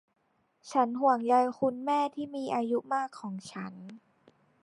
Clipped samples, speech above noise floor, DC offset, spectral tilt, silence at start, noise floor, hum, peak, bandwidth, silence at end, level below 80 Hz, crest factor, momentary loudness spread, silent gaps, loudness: under 0.1%; 38 dB; under 0.1%; -5.5 dB/octave; 0.65 s; -67 dBFS; none; -12 dBFS; 11.5 kHz; 0.65 s; -80 dBFS; 18 dB; 16 LU; none; -30 LUFS